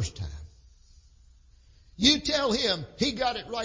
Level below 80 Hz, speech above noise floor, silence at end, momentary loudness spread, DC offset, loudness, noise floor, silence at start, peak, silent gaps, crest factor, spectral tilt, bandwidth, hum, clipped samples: -46 dBFS; 30 dB; 0 s; 18 LU; under 0.1%; -25 LUFS; -56 dBFS; 0 s; -6 dBFS; none; 24 dB; -3.5 dB/octave; 7.8 kHz; none; under 0.1%